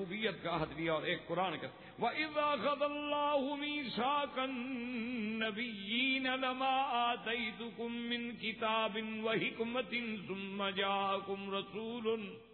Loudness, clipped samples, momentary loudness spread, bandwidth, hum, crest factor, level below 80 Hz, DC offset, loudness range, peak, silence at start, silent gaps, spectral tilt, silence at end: -37 LUFS; under 0.1%; 7 LU; 4.5 kHz; none; 14 dB; -70 dBFS; under 0.1%; 2 LU; -22 dBFS; 0 s; none; -7.5 dB/octave; 0 s